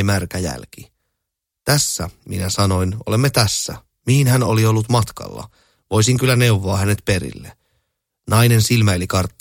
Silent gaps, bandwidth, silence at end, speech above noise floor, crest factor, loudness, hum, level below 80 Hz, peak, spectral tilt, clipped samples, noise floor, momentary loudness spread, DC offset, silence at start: none; 17 kHz; 0.1 s; 63 dB; 18 dB; -17 LUFS; none; -42 dBFS; 0 dBFS; -5 dB/octave; under 0.1%; -80 dBFS; 13 LU; under 0.1%; 0 s